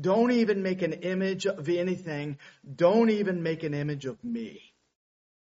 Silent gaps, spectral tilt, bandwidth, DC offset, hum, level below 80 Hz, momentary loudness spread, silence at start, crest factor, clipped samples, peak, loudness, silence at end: none; -6 dB/octave; 7.6 kHz; under 0.1%; none; -70 dBFS; 13 LU; 0 s; 18 dB; under 0.1%; -10 dBFS; -28 LUFS; 1 s